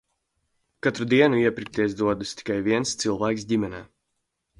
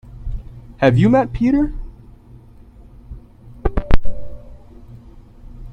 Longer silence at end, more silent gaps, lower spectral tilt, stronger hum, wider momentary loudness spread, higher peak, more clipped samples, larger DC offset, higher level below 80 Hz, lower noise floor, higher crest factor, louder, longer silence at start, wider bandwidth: first, 0.75 s vs 0 s; neither; second, -5 dB/octave vs -9 dB/octave; neither; second, 9 LU vs 27 LU; second, -6 dBFS vs 0 dBFS; neither; neither; second, -56 dBFS vs -26 dBFS; first, -78 dBFS vs -42 dBFS; about the same, 20 dB vs 18 dB; second, -24 LUFS vs -18 LUFS; first, 0.85 s vs 0.15 s; first, 11.5 kHz vs 6 kHz